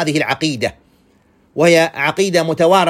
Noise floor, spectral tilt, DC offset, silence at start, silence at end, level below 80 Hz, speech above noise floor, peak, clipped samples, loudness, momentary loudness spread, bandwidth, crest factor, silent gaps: -54 dBFS; -4.5 dB/octave; under 0.1%; 0 s; 0 s; -54 dBFS; 40 dB; 0 dBFS; under 0.1%; -15 LUFS; 10 LU; 16 kHz; 14 dB; none